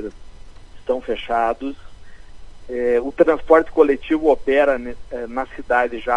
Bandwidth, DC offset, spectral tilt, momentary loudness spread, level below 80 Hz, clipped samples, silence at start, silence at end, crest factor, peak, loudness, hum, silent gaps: 10.5 kHz; under 0.1%; -6 dB/octave; 15 LU; -40 dBFS; under 0.1%; 0 s; 0 s; 18 dB; 0 dBFS; -19 LUFS; none; none